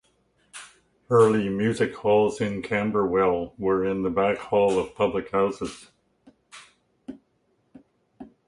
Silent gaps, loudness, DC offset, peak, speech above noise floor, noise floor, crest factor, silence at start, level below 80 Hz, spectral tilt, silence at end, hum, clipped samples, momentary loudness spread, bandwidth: none; -24 LUFS; under 0.1%; -6 dBFS; 46 dB; -69 dBFS; 20 dB; 0.55 s; -56 dBFS; -6.5 dB/octave; 0.2 s; none; under 0.1%; 23 LU; 11.5 kHz